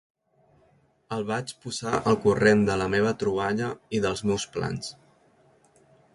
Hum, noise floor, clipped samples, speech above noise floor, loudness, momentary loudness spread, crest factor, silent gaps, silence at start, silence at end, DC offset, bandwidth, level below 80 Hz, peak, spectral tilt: none; -63 dBFS; under 0.1%; 38 dB; -26 LUFS; 13 LU; 20 dB; none; 1.1 s; 1.25 s; under 0.1%; 11.5 kHz; -54 dBFS; -6 dBFS; -5.5 dB/octave